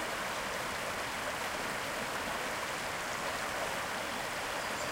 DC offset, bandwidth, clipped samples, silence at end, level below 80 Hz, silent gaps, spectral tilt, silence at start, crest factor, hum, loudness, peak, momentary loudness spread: under 0.1%; 16 kHz; under 0.1%; 0 s; -60 dBFS; none; -2 dB/octave; 0 s; 14 dB; none; -36 LUFS; -24 dBFS; 1 LU